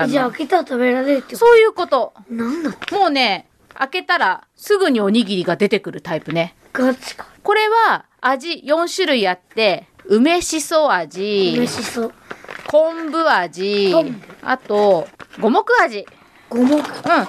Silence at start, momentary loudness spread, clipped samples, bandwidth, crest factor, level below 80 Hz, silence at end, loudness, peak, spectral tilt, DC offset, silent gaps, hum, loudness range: 0 s; 11 LU; under 0.1%; 13.5 kHz; 14 dB; -58 dBFS; 0 s; -17 LUFS; -2 dBFS; -4 dB/octave; under 0.1%; none; none; 2 LU